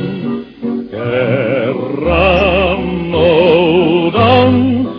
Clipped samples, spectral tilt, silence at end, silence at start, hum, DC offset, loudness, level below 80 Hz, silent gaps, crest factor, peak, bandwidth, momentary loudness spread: under 0.1%; -8.5 dB/octave; 0 s; 0 s; none; under 0.1%; -12 LUFS; -30 dBFS; none; 12 dB; 0 dBFS; 5.4 kHz; 11 LU